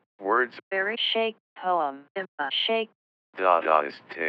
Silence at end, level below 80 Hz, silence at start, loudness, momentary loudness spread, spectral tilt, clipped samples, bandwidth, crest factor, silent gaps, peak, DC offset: 0 s; under -90 dBFS; 0.2 s; -26 LUFS; 13 LU; 1 dB/octave; under 0.1%; 6.2 kHz; 22 dB; 0.63-0.71 s, 1.40-1.56 s, 2.10-2.15 s, 2.28-2.38 s, 2.95-3.33 s; -6 dBFS; under 0.1%